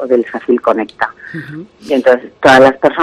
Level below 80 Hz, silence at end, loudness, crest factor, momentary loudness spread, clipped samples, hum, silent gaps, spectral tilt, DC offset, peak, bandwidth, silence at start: -50 dBFS; 0 s; -11 LUFS; 12 dB; 20 LU; 0.3%; none; none; -5 dB/octave; under 0.1%; 0 dBFS; 13 kHz; 0 s